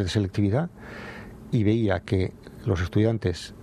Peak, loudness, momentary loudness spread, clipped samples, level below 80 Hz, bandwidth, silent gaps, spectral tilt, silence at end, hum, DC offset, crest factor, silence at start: -10 dBFS; -26 LUFS; 16 LU; under 0.1%; -46 dBFS; 11 kHz; none; -7 dB/octave; 0 s; none; under 0.1%; 16 dB; 0 s